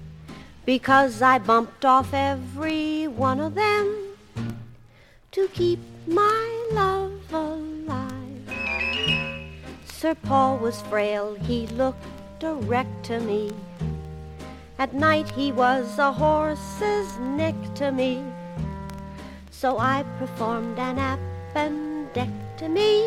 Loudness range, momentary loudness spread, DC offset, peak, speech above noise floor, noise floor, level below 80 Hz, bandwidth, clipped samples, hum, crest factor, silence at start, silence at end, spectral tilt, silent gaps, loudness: 6 LU; 16 LU; under 0.1%; -4 dBFS; 29 dB; -52 dBFS; -46 dBFS; 16 kHz; under 0.1%; none; 20 dB; 0 s; 0 s; -5.5 dB/octave; none; -24 LUFS